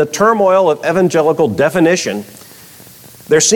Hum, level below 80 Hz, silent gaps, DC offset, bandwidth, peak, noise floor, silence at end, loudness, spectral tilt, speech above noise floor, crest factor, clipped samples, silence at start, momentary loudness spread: none; -54 dBFS; none; under 0.1%; 19 kHz; -2 dBFS; -38 dBFS; 0 s; -12 LUFS; -4 dB/octave; 26 dB; 12 dB; under 0.1%; 0 s; 8 LU